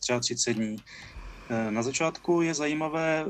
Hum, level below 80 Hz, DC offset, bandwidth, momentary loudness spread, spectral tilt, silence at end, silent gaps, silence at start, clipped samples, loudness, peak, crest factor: none; -54 dBFS; under 0.1%; 12 kHz; 18 LU; -3.5 dB/octave; 0 s; none; 0 s; under 0.1%; -28 LUFS; -14 dBFS; 16 dB